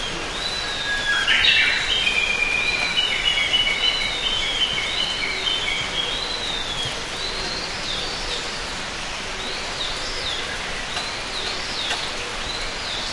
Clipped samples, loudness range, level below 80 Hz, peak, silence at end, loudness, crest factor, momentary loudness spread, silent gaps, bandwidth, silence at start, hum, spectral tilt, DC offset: under 0.1%; 8 LU; -38 dBFS; -4 dBFS; 0 s; -21 LUFS; 20 dB; 9 LU; none; 11.5 kHz; 0 s; none; -1 dB/octave; under 0.1%